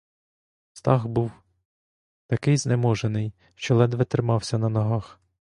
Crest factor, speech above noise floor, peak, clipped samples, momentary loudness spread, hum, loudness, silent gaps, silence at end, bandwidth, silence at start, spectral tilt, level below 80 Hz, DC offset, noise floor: 22 dB; over 67 dB; -4 dBFS; under 0.1%; 9 LU; none; -24 LUFS; 1.65-2.29 s; 0.5 s; 11.5 kHz; 0.75 s; -6.5 dB/octave; -54 dBFS; under 0.1%; under -90 dBFS